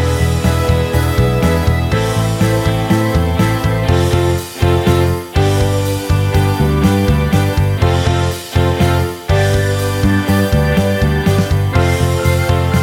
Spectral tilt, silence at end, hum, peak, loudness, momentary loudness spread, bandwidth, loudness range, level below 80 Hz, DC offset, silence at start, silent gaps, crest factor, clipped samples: -6 dB/octave; 0 s; none; -2 dBFS; -14 LUFS; 2 LU; 17 kHz; 1 LU; -24 dBFS; under 0.1%; 0 s; none; 12 dB; under 0.1%